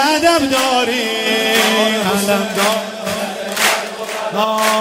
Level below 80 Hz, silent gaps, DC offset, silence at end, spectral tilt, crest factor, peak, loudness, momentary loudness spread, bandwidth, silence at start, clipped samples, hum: -54 dBFS; none; under 0.1%; 0 s; -2.5 dB/octave; 16 dB; 0 dBFS; -15 LUFS; 9 LU; 16.5 kHz; 0 s; under 0.1%; none